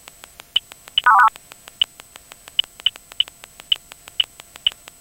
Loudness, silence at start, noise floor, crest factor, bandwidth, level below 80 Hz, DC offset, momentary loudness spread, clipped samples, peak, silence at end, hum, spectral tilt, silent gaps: -20 LUFS; 0.55 s; -44 dBFS; 20 dB; 17 kHz; -58 dBFS; under 0.1%; 9 LU; under 0.1%; -2 dBFS; 0.3 s; none; 1.5 dB/octave; none